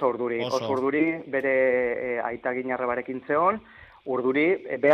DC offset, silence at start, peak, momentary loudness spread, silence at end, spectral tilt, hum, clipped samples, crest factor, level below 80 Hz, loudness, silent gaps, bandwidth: under 0.1%; 0 s; -8 dBFS; 7 LU; 0 s; -6 dB/octave; none; under 0.1%; 18 dB; -64 dBFS; -25 LUFS; none; 7 kHz